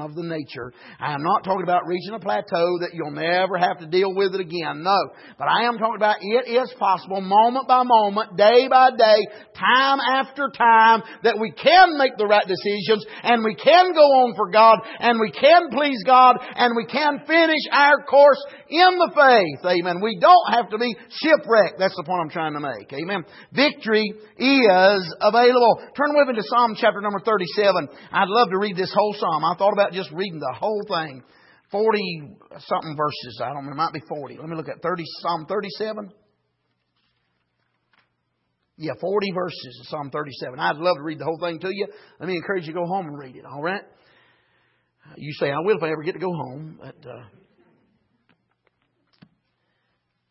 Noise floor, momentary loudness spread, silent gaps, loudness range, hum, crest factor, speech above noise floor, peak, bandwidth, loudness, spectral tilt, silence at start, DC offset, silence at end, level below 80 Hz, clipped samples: -73 dBFS; 16 LU; none; 14 LU; none; 18 dB; 54 dB; -2 dBFS; 5.8 kHz; -19 LUFS; -8 dB/octave; 0 s; under 0.1%; 3.1 s; -70 dBFS; under 0.1%